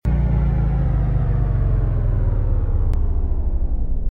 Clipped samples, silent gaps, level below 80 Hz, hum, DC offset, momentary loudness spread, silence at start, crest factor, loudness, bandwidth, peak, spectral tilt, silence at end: under 0.1%; none; -20 dBFS; none; under 0.1%; 5 LU; 0.05 s; 10 dB; -21 LUFS; 3.1 kHz; -6 dBFS; -11 dB/octave; 0 s